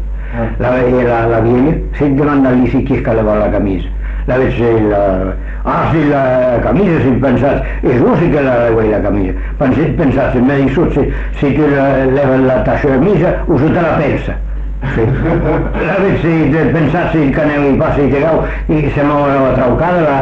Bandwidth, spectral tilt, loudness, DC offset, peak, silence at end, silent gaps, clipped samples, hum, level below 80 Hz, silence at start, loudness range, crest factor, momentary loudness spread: 7.2 kHz; -9.5 dB/octave; -12 LUFS; under 0.1%; -2 dBFS; 0 s; none; under 0.1%; none; -22 dBFS; 0 s; 2 LU; 8 dB; 6 LU